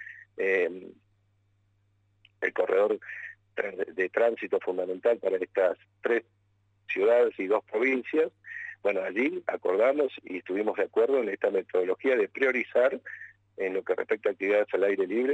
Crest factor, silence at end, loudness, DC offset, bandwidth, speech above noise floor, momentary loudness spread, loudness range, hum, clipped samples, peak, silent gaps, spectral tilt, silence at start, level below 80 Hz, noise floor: 16 dB; 0 s; -28 LUFS; under 0.1%; 8 kHz; 42 dB; 10 LU; 4 LU; none; under 0.1%; -12 dBFS; none; -6 dB/octave; 0 s; -82 dBFS; -69 dBFS